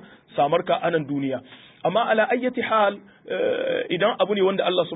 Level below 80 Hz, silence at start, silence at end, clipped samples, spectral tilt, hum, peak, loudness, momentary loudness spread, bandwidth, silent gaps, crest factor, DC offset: -70 dBFS; 0.3 s; 0 s; under 0.1%; -10 dB/octave; none; -8 dBFS; -23 LUFS; 8 LU; 4 kHz; none; 16 dB; under 0.1%